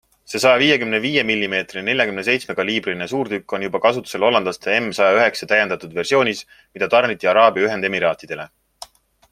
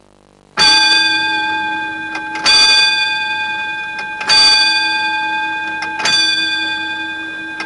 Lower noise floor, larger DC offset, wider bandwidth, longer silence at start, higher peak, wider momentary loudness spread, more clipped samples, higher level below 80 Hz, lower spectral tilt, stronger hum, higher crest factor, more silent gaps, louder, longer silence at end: second, -43 dBFS vs -48 dBFS; neither; first, 15.5 kHz vs 11.5 kHz; second, 0.3 s vs 0.55 s; about the same, 0 dBFS vs -2 dBFS; second, 10 LU vs 14 LU; neither; second, -60 dBFS vs -52 dBFS; first, -4 dB/octave vs 0.5 dB/octave; neither; about the same, 18 dB vs 14 dB; neither; second, -18 LUFS vs -12 LUFS; first, 0.85 s vs 0 s